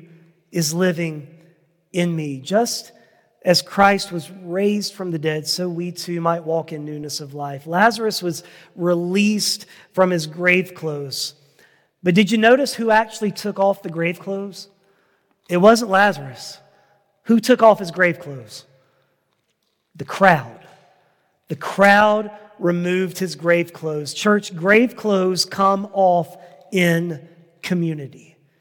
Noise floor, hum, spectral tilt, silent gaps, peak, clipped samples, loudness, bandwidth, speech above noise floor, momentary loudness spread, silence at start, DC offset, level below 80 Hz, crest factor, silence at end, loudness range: -70 dBFS; none; -4.5 dB/octave; none; 0 dBFS; under 0.1%; -19 LUFS; 17.5 kHz; 51 dB; 16 LU; 0.55 s; under 0.1%; -62 dBFS; 20 dB; 0.45 s; 4 LU